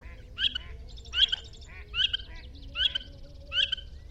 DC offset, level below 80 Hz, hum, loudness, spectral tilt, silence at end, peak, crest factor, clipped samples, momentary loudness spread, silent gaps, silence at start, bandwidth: under 0.1%; -46 dBFS; none; -28 LUFS; -1.5 dB/octave; 0 s; -10 dBFS; 22 dB; under 0.1%; 21 LU; none; 0 s; 8.8 kHz